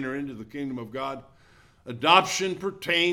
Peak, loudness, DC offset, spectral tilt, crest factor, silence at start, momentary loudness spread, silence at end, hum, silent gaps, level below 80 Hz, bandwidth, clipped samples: -4 dBFS; -25 LUFS; under 0.1%; -3 dB/octave; 24 dB; 0 s; 16 LU; 0 s; none; none; -64 dBFS; 17.5 kHz; under 0.1%